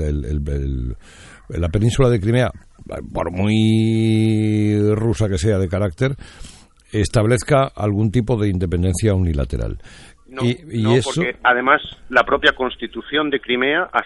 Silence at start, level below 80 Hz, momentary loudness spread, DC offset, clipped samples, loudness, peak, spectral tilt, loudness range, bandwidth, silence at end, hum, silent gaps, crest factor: 0 s; -34 dBFS; 11 LU; under 0.1%; under 0.1%; -19 LUFS; -2 dBFS; -6 dB/octave; 3 LU; 11.5 kHz; 0 s; none; none; 18 dB